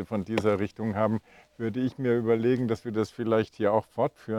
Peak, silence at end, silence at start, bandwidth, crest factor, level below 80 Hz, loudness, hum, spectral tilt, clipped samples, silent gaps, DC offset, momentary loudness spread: -10 dBFS; 0 s; 0 s; 13 kHz; 18 dB; -64 dBFS; -28 LUFS; none; -8 dB/octave; under 0.1%; none; under 0.1%; 6 LU